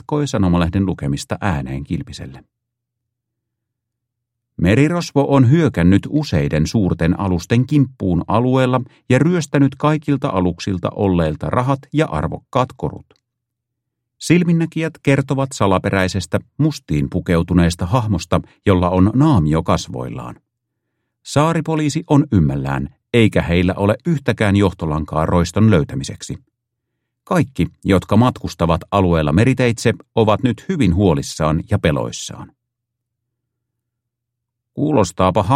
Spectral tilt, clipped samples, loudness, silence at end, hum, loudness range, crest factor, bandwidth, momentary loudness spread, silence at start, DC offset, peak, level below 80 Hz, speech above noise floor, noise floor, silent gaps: -7 dB/octave; under 0.1%; -17 LUFS; 0 s; none; 6 LU; 18 dB; 13 kHz; 10 LU; 0.1 s; under 0.1%; 0 dBFS; -36 dBFS; 63 dB; -79 dBFS; none